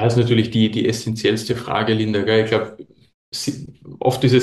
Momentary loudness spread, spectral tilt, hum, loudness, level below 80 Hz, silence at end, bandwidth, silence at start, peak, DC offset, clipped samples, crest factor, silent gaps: 12 LU; -6 dB/octave; none; -19 LUFS; -52 dBFS; 0 s; 12.5 kHz; 0 s; -2 dBFS; under 0.1%; under 0.1%; 16 dB; 3.14-3.32 s